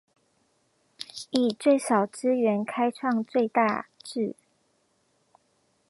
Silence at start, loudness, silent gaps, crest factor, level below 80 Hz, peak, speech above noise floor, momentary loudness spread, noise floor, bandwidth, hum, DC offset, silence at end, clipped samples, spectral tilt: 1 s; -26 LUFS; none; 20 dB; -80 dBFS; -8 dBFS; 45 dB; 12 LU; -70 dBFS; 11.5 kHz; none; under 0.1%; 1.55 s; under 0.1%; -5 dB/octave